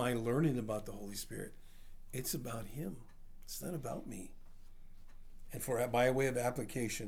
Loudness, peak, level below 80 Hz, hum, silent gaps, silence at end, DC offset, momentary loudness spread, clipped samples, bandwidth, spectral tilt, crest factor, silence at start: -38 LUFS; -18 dBFS; -54 dBFS; none; none; 0 s; under 0.1%; 17 LU; under 0.1%; over 20 kHz; -5 dB/octave; 20 dB; 0 s